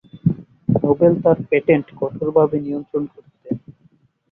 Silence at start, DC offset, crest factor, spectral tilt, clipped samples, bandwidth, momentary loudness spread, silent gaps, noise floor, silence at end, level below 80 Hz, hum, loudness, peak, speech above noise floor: 0.15 s; under 0.1%; 16 dB; -12 dB/octave; under 0.1%; 3.7 kHz; 14 LU; none; -57 dBFS; 0.6 s; -52 dBFS; none; -19 LUFS; -2 dBFS; 39 dB